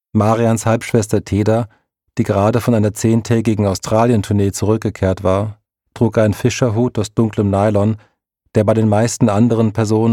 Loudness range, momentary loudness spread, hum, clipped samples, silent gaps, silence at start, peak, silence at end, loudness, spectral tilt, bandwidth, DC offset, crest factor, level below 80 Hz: 1 LU; 5 LU; none; under 0.1%; none; 0.15 s; -2 dBFS; 0 s; -16 LUFS; -7 dB/octave; 15 kHz; under 0.1%; 14 dB; -46 dBFS